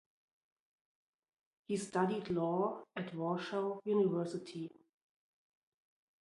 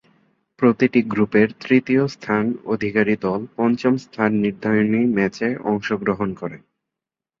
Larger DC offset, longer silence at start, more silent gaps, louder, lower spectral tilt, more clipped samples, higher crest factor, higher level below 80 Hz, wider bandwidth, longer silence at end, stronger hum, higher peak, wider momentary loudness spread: neither; first, 1.7 s vs 0.6 s; neither; second, -37 LUFS vs -20 LUFS; about the same, -6.5 dB/octave vs -7.5 dB/octave; neither; about the same, 20 dB vs 18 dB; second, -78 dBFS vs -58 dBFS; first, 11.5 kHz vs 7.4 kHz; first, 1.5 s vs 0.85 s; neither; second, -18 dBFS vs -2 dBFS; first, 11 LU vs 6 LU